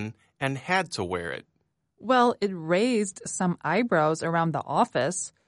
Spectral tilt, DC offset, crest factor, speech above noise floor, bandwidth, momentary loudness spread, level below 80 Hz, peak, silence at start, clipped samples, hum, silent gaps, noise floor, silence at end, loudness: -4.5 dB/octave; under 0.1%; 18 dB; 41 dB; 11.5 kHz; 10 LU; -64 dBFS; -10 dBFS; 0 s; under 0.1%; none; none; -67 dBFS; 0.2 s; -26 LUFS